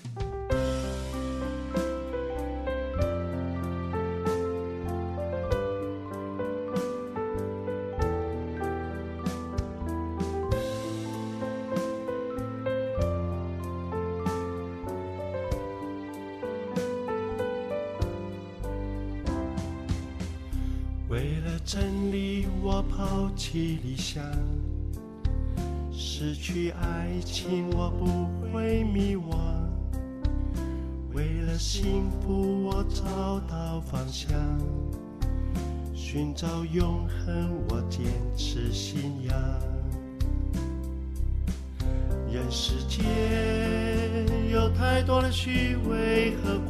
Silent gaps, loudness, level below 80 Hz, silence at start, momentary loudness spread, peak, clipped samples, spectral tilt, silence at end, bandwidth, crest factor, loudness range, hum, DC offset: none; -31 LUFS; -34 dBFS; 0 s; 8 LU; -10 dBFS; under 0.1%; -6 dB/octave; 0 s; 14 kHz; 18 dB; 5 LU; none; under 0.1%